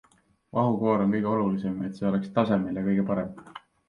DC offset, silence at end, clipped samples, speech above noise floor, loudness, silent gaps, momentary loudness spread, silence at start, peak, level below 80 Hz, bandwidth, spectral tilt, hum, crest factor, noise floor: under 0.1%; 0.3 s; under 0.1%; 27 dB; -26 LUFS; none; 8 LU; 0.55 s; -10 dBFS; -60 dBFS; 5.6 kHz; -9.5 dB/octave; none; 18 dB; -53 dBFS